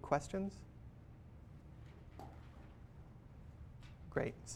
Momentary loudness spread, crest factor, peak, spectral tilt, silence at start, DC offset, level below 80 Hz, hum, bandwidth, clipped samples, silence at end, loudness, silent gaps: 17 LU; 26 dB; -20 dBFS; -6 dB/octave; 0 s; under 0.1%; -60 dBFS; none; 14.5 kHz; under 0.1%; 0 s; -46 LUFS; none